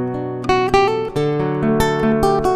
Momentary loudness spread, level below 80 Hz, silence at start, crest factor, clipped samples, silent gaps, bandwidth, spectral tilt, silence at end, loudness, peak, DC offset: 4 LU; -34 dBFS; 0 s; 16 dB; under 0.1%; none; 14 kHz; -6 dB/octave; 0 s; -17 LUFS; -2 dBFS; under 0.1%